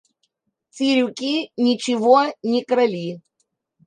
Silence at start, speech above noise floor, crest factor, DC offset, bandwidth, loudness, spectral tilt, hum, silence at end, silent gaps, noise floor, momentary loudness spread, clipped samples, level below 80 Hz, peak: 0.75 s; 53 dB; 18 dB; under 0.1%; 9.8 kHz; -20 LUFS; -4.5 dB/octave; none; 0.65 s; none; -72 dBFS; 10 LU; under 0.1%; -74 dBFS; -2 dBFS